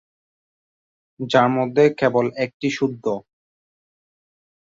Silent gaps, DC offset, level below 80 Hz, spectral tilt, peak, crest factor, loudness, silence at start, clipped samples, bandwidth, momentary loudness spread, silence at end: 2.54-2.60 s; under 0.1%; -64 dBFS; -6 dB/octave; -2 dBFS; 20 dB; -20 LUFS; 1.2 s; under 0.1%; 7.8 kHz; 10 LU; 1.5 s